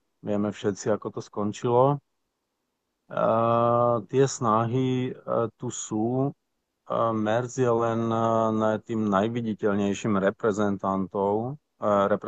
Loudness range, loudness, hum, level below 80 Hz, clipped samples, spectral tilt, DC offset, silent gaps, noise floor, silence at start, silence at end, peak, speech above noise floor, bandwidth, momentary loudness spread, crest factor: 3 LU; -26 LUFS; none; -68 dBFS; under 0.1%; -6.5 dB/octave; under 0.1%; none; -79 dBFS; 0.25 s; 0 s; -8 dBFS; 54 dB; 8.8 kHz; 9 LU; 18 dB